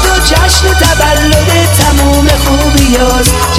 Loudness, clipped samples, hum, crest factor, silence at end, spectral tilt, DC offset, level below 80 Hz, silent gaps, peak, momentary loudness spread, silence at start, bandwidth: -7 LUFS; 1%; none; 6 dB; 0 s; -4 dB/octave; under 0.1%; -12 dBFS; none; 0 dBFS; 1 LU; 0 s; 16 kHz